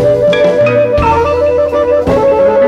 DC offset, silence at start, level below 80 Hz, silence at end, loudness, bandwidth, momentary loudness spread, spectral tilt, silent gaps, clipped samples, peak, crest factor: under 0.1%; 0 s; -28 dBFS; 0 s; -10 LUFS; 8.8 kHz; 2 LU; -7 dB/octave; none; under 0.1%; 0 dBFS; 8 dB